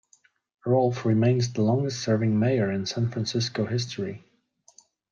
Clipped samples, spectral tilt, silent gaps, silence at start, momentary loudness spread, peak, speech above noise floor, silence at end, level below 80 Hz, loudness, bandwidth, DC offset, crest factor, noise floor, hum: under 0.1%; -6.5 dB/octave; none; 0.65 s; 9 LU; -10 dBFS; 39 dB; 0.95 s; -66 dBFS; -25 LUFS; 7.4 kHz; under 0.1%; 16 dB; -63 dBFS; none